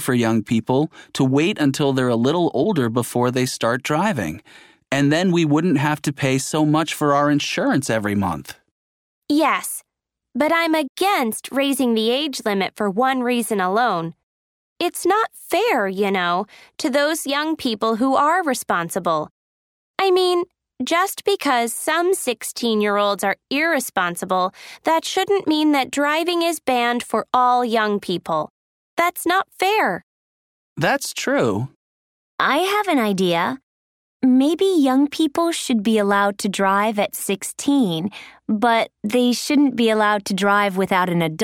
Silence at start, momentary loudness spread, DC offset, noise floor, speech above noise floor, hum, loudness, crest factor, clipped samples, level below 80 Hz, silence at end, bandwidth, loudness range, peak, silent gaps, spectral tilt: 0 s; 7 LU; under 0.1%; -82 dBFS; 63 dB; none; -19 LUFS; 16 dB; under 0.1%; -62 dBFS; 0 s; 17.5 kHz; 3 LU; -2 dBFS; 8.71-9.22 s, 10.89-10.95 s, 14.23-14.76 s, 19.31-19.94 s, 28.50-28.97 s, 30.03-30.76 s, 31.76-32.38 s, 33.63-34.20 s; -4.5 dB/octave